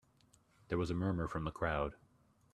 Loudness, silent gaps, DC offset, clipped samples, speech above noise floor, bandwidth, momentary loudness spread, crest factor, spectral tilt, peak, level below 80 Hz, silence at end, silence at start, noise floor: -38 LUFS; none; under 0.1%; under 0.1%; 33 dB; 10.5 kHz; 4 LU; 20 dB; -7.5 dB/octave; -20 dBFS; -54 dBFS; 0.6 s; 0.7 s; -70 dBFS